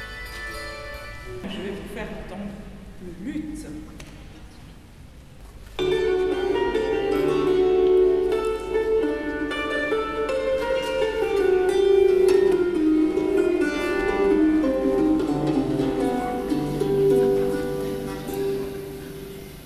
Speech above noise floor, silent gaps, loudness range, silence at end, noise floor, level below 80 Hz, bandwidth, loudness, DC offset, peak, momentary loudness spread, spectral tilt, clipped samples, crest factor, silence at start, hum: 11 dB; none; 14 LU; 0 s; -44 dBFS; -42 dBFS; 14 kHz; -22 LUFS; under 0.1%; -8 dBFS; 17 LU; -6 dB/octave; under 0.1%; 14 dB; 0 s; none